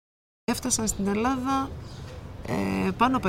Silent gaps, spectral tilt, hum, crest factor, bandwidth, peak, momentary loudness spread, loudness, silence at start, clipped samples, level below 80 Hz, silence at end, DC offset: none; -4.5 dB/octave; none; 20 dB; 16 kHz; -8 dBFS; 16 LU; -27 LUFS; 0.5 s; under 0.1%; -44 dBFS; 0 s; under 0.1%